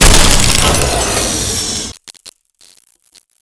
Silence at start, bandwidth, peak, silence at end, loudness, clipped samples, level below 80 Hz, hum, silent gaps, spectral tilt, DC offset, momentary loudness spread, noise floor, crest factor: 0 s; 11 kHz; 0 dBFS; 1.1 s; -11 LUFS; 0.6%; -18 dBFS; none; none; -2.5 dB/octave; under 0.1%; 13 LU; -50 dBFS; 12 dB